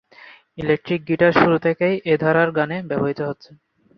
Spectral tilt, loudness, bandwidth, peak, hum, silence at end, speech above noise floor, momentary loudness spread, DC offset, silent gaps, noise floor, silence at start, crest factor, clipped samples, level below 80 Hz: -8.5 dB/octave; -19 LUFS; 6.2 kHz; -2 dBFS; none; 0.45 s; 27 dB; 12 LU; under 0.1%; none; -47 dBFS; 0.25 s; 18 dB; under 0.1%; -56 dBFS